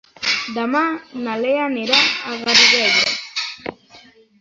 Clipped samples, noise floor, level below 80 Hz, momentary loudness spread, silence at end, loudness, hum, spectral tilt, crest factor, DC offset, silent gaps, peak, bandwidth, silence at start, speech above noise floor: under 0.1%; -47 dBFS; -62 dBFS; 15 LU; 0.4 s; -16 LUFS; none; -1 dB/octave; 20 dB; under 0.1%; none; 0 dBFS; 8 kHz; 0.2 s; 30 dB